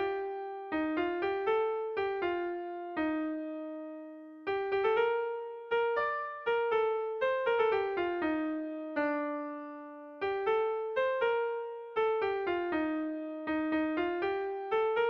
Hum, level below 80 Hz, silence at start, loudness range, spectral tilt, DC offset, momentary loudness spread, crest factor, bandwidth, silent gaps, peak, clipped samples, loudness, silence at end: none; -68 dBFS; 0 s; 3 LU; -6.5 dB/octave; under 0.1%; 10 LU; 14 dB; 5.6 kHz; none; -18 dBFS; under 0.1%; -33 LUFS; 0 s